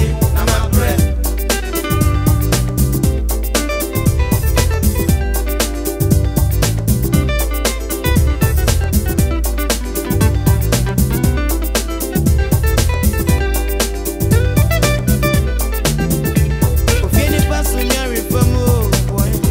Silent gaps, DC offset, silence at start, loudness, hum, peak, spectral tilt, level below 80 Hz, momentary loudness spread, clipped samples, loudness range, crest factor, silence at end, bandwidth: none; under 0.1%; 0 s; -16 LUFS; none; 0 dBFS; -5 dB/octave; -18 dBFS; 4 LU; under 0.1%; 1 LU; 14 dB; 0 s; 16.5 kHz